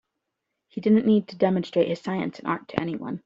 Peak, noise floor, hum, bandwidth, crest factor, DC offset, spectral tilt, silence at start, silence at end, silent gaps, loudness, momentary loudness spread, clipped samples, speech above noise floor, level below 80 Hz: -4 dBFS; -82 dBFS; none; 7.6 kHz; 22 dB; under 0.1%; -8 dB/octave; 0.75 s; 0.05 s; none; -24 LUFS; 10 LU; under 0.1%; 58 dB; -64 dBFS